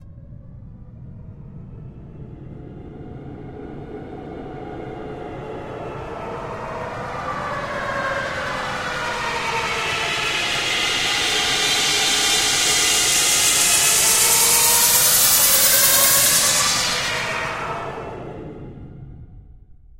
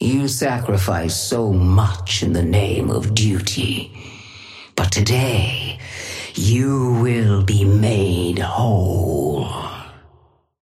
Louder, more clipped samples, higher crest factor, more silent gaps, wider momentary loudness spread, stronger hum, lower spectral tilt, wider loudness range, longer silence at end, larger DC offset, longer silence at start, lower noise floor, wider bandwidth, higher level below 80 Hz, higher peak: about the same, -16 LUFS vs -18 LUFS; neither; first, 20 dB vs 14 dB; neither; first, 23 LU vs 13 LU; neither; second, 0 dB/octave vs -5.5 dB/octave; first, 22 LU vs 3 LU; second, 0 s vs 0.7 s; neither; about the same, 0 s vs 0 s; second, -44 dBFS vs -55 dBFS; about the same, 16 kHz vs 15 kHz; second, -44 dBFS vs -38 dBFS; about the same, -2 dBFS vs -4 dBFS